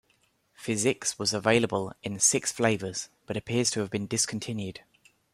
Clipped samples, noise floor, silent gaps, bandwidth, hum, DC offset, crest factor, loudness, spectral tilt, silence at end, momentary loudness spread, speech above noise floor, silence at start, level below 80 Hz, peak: under 0.1%; -69 dBFS; none; 15 kHz; none; under 0.1%; 22 dB; -27 LUFS; -3 dB/octave; 0.55 s; 13 LU; 41 dB; 0.6 s; -66 dBFS; -8 dBFS